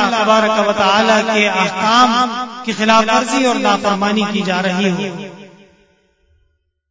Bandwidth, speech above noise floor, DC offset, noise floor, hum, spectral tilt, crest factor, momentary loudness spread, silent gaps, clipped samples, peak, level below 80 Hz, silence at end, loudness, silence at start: 8 kHz; 48 dB; under 0.1%; -62 dBFS; none; -4 dB/octave; 16 dB; 10 LU; none; under 0.1%; 0 dBFS; -56 dBFS; 1.45 s; -14 LUFS; 0 s